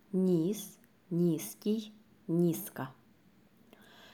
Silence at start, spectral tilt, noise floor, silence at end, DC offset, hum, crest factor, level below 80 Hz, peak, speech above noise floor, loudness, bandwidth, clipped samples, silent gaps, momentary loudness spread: 0.1 s; -7 dB/octave; -64 dBFS; 0.05 s; under 0.1%; none; 16 dB; -78 dBFS; -20 dBFS; 33 dB; -33 LUFS; 19.5 kHz; under 0.1%; none; 16 LU